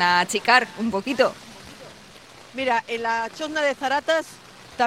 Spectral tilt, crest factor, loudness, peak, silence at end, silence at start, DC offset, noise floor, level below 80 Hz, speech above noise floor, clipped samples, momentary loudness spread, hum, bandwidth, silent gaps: -3 dB/octave; 22 dB; -22 LUFS; -2 dBFS; 0 s; 0 s; under 0.1%; -46 dBFS; -62 dBFS; 24 dB; under 0.1%; 23 LU; none; 16 kHz; none